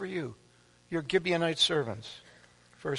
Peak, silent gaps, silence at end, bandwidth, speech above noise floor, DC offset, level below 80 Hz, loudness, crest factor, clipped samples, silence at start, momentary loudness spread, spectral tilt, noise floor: -12 dBFS; none; 0 s; 11.5 kHz; 28 dB; under 0.1%; -64 dBFS; -30 LUFS; 20 dB; under 0.1%; 0 s; 17 LU; -4 dB/octave; -59 dBFS